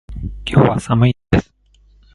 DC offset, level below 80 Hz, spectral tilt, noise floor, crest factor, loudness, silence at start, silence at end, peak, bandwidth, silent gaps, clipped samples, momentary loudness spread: under 0.1%; -32 dBFS; -7.5 dB/octave; -52 dBFS; 18 dB; -16 LUFS; 0.1 s; 0.75 s; 0 dBFS; 11.5 kHz; none; under 0.1%; 11 LU